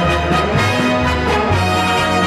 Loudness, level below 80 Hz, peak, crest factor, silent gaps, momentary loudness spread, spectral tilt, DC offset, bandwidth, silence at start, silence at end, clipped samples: -15 LUFS; -28 dBFS; -2 dBFS; 12 dB; none; 1 LU; -5 dB/octave; under 0.1%; 14 kHz; 0 s; 0 s; under 0.1%